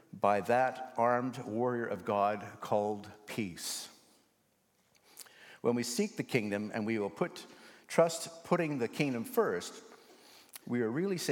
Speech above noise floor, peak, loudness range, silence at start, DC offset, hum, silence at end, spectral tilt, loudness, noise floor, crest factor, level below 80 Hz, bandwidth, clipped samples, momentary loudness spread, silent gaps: 41 dB; -10 dBFS; 5 LU; 0.15 s; under 0.1%; none; 0 s; -5 dB/octave; -34 LUFS; -74 dBFS; 24 dB; -84 dBFS; 17.5 kHz; under 0.1%; 17 LU; none